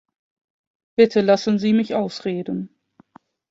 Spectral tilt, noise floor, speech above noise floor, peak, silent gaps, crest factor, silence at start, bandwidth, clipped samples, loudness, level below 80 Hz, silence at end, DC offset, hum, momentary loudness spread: -6.5 dB/octave; -53 dBFS; 34 dB; -2 dBFS; none; 20 dB; 1 s; 7.8 kHz; under 0.1%; -20 LUFS; -66 dBFS; 0.85 s; under 0.1%; none; 13 LU